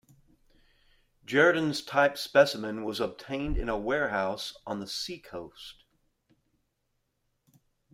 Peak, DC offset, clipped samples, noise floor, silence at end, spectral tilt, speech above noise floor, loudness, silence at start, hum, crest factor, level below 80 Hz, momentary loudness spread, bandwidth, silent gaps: -8 dBFS; under 0.1%; under 0.1%; -78 dBFS; 2.2 s; -4.5 dB/octave; 49 dB; -28 LUFS; 1.3 s; none; 22 dB; -46 dBFS; 18 LU; 16 kHz; none